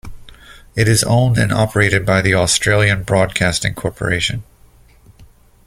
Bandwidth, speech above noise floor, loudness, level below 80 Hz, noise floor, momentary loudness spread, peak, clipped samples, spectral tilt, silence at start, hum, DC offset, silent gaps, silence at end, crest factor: 15.5 kHz; 32 dB; -15 LUFS; -38 dBFS; -47 dBFS; 8 LU; 0 dBFS; under 0.1%; -4.5 dB/octave; 0.05 s; none; under 0.1%; none; 0.4 s; 16 dB